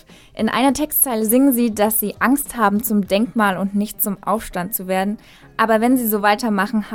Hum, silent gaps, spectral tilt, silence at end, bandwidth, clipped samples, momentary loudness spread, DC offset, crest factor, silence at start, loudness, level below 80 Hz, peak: none; none; -4 dB/octave; 0 s; 17.5 kHz; under 0.1%; 8 LU; under 0.1%; 16 dB; 0.35 s; -18 LUFS; -48 dBFS; -2 dBFS